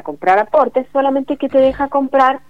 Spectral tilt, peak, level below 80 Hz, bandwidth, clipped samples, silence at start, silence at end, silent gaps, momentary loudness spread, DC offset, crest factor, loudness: -6.5 dB/octave; 0 dBFS; -46 dBFS; 6.8 kHz; under 0.1%; 0.05 s; 0.1 s; none; 4 LU; 0.8%; 14 dB; -15 LUFS